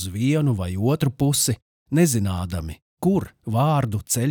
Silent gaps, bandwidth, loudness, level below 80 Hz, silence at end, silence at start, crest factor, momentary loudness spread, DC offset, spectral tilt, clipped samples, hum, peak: 1.62-1.86 s, 2.82-2.97 s; over 20 kHz; -22 LUFS; -48 dBFS; 0 s; 0 s; 16 dB; 8 LU; under 0.1%; -5.5 dB/octave; under 0.1%; none; -6 dBFS